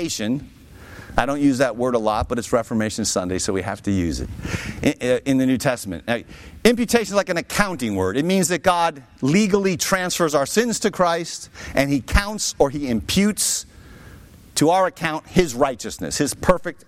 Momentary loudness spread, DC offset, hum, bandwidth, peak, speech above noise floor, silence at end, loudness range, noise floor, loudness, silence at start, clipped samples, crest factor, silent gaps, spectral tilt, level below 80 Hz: 8 LU; under 0.1%; none; 16.5 kHz; -2 dBFS; 23 dB; 0.1 s; 3 LU; -44 dBFS; -21 LUFS; 0 s; under 0.1%; 18 dB; none; -4 dB/octave; -36 dBFS